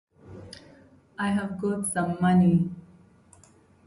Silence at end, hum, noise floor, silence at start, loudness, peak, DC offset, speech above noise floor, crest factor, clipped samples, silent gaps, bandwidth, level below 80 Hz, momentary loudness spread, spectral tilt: 1.05 s; none; -57 dBFS; 0.25 s; -25 LUFS; -12 dBFS; under 0.1%; 33 dB; 16 dB; under 0.1%; none; 11.5 kHz; -56 dBFS; 25 LU; -6.5 dB/octave